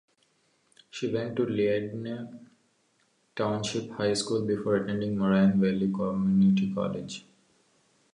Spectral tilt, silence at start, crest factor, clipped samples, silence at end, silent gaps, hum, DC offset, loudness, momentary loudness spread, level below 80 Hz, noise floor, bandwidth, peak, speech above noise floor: -6.5 dB/octave; 0.95 s; 16 dB; under 0.1%; 0.95 s; none; none; under 0.1%; -28 LUFS; 15 LU; -62 dBFS; -70 dBFS; 11 kHz; -12 dBFS; 43 dB